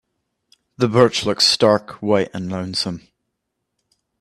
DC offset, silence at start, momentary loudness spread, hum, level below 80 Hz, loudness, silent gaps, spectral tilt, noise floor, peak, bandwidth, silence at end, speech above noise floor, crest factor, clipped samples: under 0.1%; 0.8 s; 12 LU; none; -58 dBFS; -18 LUFS; none; -4.5 dB/octave; -77 dBFS; 0 dBFS; 13 kHz; 1.25 s; 59 dB; 20 dB; under 0.1%